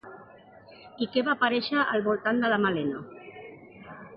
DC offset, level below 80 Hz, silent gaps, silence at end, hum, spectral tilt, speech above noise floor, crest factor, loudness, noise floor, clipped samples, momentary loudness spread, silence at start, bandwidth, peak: under 0.1%; -68 dBFS; none; 0 s; none; -9 dB/octave; 25 dB; 16 dB; -26 LUFS; -51 dBFS; under 0.1%; 21 LU; 0.05 s; 5.6 kHz; -12 dBFS